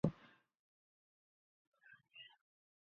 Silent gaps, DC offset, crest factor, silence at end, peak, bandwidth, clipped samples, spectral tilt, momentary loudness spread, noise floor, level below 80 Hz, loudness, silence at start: 0.59-1.72 s; under 0.1%; 30 dB; 0.65 s; -20 dBFS; 6.8 kHz; under 0.1%; -7.5 dB/octave; 16 LU; -67 dBFS; -72 dBFS; -50 LUFS; 0.05 s